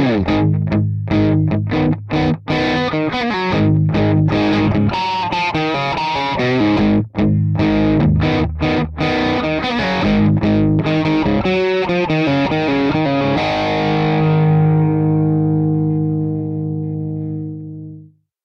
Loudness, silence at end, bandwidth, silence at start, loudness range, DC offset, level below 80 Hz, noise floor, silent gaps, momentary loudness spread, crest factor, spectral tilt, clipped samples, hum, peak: -16 LUFS; 0.4 s; 6.6 kHz; 0 s; 2 LU; under 0.1%; -34 dBFS; -41 dBFS; none; 5 LU; 10 dB; -8 dB/octave; under 0.1%; none; -6 dBFS